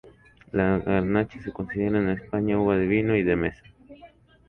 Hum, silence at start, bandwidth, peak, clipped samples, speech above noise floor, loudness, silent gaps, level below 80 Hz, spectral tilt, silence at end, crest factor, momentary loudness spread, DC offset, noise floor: none; 0.05 s; 4.3 kHz; -10 dBFS; under 0.1%; 28 dB; -25 LUFS; none; -46 dBFS; -10 dB/octave; 0.45 s; 16 dB; 9 LU; under 0.1%; -52 dBFS